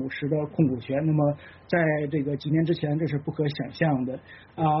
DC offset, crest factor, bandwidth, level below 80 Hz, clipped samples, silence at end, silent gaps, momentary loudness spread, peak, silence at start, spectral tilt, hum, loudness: under 0.1%; 16 dB; 5.8 kHz; -60 dBFS; under 0.1%; 0 s; none; 5 LU; -10 dBFS; 0 s; -7 dB/octave; none; -26 LUFS